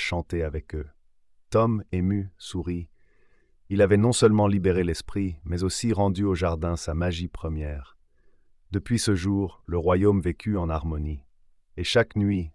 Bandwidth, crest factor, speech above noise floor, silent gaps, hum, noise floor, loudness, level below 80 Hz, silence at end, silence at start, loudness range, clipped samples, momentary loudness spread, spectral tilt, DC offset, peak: 12 kHz; 18 dB; 34 dB; none; none; -58 dBFS; -25 LUFS; -44 dBFS; 0.05 s; 0 s; 6 LU; under 0.1%; 14 LU; -6 dB/octave; under 0.1%; -8 dBFS